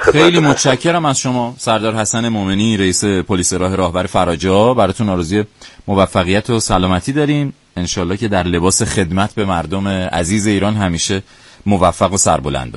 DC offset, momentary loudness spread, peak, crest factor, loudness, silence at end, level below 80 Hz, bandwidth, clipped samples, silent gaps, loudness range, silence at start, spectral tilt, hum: under 0.1%; 6 LU; 0 dBFS; 14 dB; -15 LUFS; 0 s; -36 dBFS; 11.5 kHz; under 0.1%; none; 2 LU; 0 s; -4.5 dB/octave; none